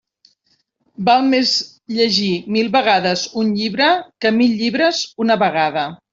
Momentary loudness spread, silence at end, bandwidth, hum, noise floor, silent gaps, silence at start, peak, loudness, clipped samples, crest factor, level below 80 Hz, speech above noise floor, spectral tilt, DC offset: 5 LU; 0.15 s; 7.8 kHz; none; -64 dBFS; none; 1 s; -2 dBFS; -16 LUFS; under 0.1%; 16 dB; -62 dBFS; 48 dB; -4 dB/octave; under 0.1%